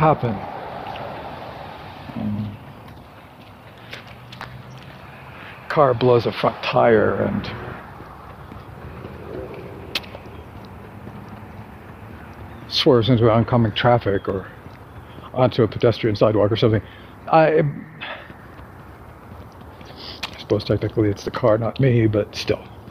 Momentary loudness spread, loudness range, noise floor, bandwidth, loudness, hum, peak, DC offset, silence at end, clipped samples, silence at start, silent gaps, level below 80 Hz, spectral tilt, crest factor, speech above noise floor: 24 LU; 15 LU; -43 dBFS; 15 kHz; -20 LUFS; none; 0 dBFS; under 0.1%; 0 s; under 0.1%; 0 s; none; -46 dBFS; -7.5 dB/octave; 22 dB; 25 dB